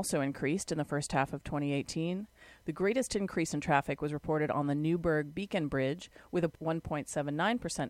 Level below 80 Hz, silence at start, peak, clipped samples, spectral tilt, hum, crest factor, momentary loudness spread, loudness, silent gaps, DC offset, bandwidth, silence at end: -56 dBFS; 0 s; -12 dBFS; under 0.1%; -5.5 dB/octave; none; 22 dB; 6 LU; -33 LUFS; none; under 0.1%; 15.5 kHz; 0 s